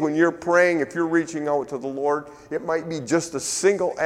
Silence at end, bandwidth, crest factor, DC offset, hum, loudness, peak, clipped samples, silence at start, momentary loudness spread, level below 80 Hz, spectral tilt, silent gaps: 0 s; 14 kHz; 18 dB; under 0.1%; none; -23 LUFS; -6 dBFS; under 0.1%; 0 s; 8 LU; -62 dBFS; -4.5 dB/octave; none